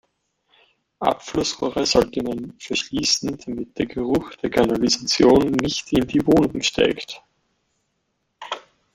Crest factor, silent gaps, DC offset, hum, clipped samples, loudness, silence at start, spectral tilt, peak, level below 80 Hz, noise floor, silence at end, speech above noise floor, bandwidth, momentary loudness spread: 20 dB; none; under 0.1%; none; under 0.1%; -21 LUFS; 1 s; -4 dB/octave; -2 dBFS; -46 dBFS; -73 dBFS; 0.35 s; 52 dB; 16 kHz; 15 LU